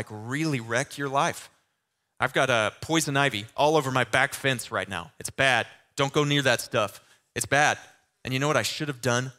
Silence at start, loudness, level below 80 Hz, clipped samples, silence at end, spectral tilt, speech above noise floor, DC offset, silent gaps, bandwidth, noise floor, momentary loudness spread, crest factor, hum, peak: 0 s; -25 LUFS; -62 dBFS; under 0.1%; 0.1 s; -3.5 dB/octave; 52 dB; under 0.1%; none; 16 kHz; -78 dBFS; 10 LU; 24 dB; none; -4 dBFS